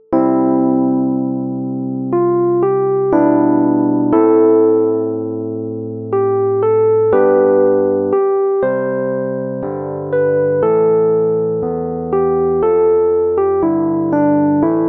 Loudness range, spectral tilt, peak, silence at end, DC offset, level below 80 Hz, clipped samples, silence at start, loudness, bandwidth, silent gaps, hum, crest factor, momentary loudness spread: 3 LU; -12.5 dB/octave; 0 dBFS; 0 s; under 0.1%; -52 dBFS; under 0.1%; 0.1 s; -15 LUFS; 2.9 kHz; none; none; 12 dB; 9 LU